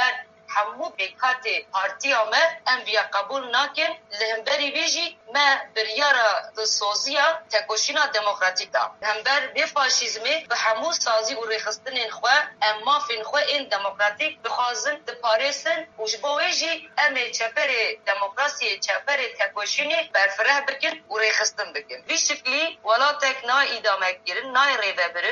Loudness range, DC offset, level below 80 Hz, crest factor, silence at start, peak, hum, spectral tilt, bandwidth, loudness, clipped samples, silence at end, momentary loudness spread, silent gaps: 2 LU; under 0.1%; -80 dBFS; 18 dB; 0 s; -6 dBFS; none; 1.5 dB/octave; 7.8 kHz; -22 LUFS; under 0.1%; 0 s; 7 LU; none